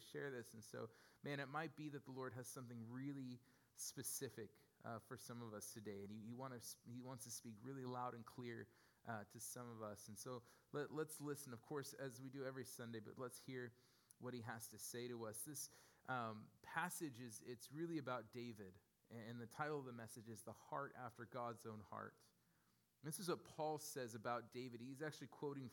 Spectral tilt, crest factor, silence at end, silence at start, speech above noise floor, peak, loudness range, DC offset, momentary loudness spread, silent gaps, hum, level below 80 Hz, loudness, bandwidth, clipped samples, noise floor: -4.5 dB/octave; 22 dB; 0 s; 0 s; 29 dB; -30 dBFS; 3 LU; under 0.1%; 9 LU; none; none; under -90 dBFS; -52 LUFS; 18 kHz; under 0.1%; -81 dBFS